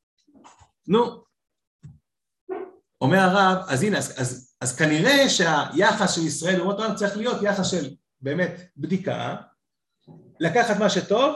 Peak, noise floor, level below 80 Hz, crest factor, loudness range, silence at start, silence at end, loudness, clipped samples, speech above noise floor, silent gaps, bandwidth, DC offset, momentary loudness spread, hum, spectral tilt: -6 dBFS; -79 dBFS; -62 dBFS; 18 dB; 7 LU; 0.85 s; 0 s; -22 LUFS; under 0.1%; 57 dB; 1.67-1.79 s, 2.41-2.47 s; 12.5 kHz; under 0.1%; 17 LU; none; -4 dB/octave